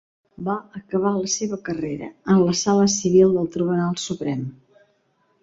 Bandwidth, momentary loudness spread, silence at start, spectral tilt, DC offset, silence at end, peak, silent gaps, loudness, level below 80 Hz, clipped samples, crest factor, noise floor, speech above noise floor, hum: 7.8 kHz; 13 LU; 0.4 s; -5 dB/octave; under 0.1%; 0.9 s; -4 dBFS; none; -21 LUFS; -58 dBFS; under 0.1%; 18 dB; -65 dBFS; 45 dB; none